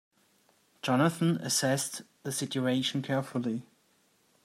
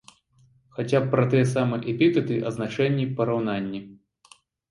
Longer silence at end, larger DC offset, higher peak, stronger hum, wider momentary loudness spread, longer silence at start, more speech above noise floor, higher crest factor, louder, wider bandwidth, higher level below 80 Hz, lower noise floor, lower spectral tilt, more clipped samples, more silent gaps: about the same, 0.8 s vs 0.75 s; neither; second, -14 dBFS vs -8 dBFS; neither; about the same, 9 LU vs 11 LU; about the same, 0.85 s vs 0.75 s; about the same, 39 dB vs 37 dB; about the same, 18 dB vs 18 dB; second, -30 LUFS vs -24 LUFS; first, 16 kHz vs 11.5 kHz; second, -78 dBFS vs -62 dBFS; first, -69 dBFS vs -60 dBFS; second, -4.5 dB/octave vs -7.5 dB/octave; neither; neither